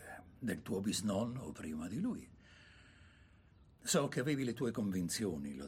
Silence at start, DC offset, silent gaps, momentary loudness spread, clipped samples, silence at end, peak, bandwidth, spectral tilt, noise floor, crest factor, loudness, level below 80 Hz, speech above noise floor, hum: 0 s; under 0.1%; none; 11 LU; under 0.1%; 0 s; -20 dBFS; 16 kHz; -4.5 dB/octave; -64 dBFS; 20 dB; -39 LUFS; -66 dBFS; 26 dB; none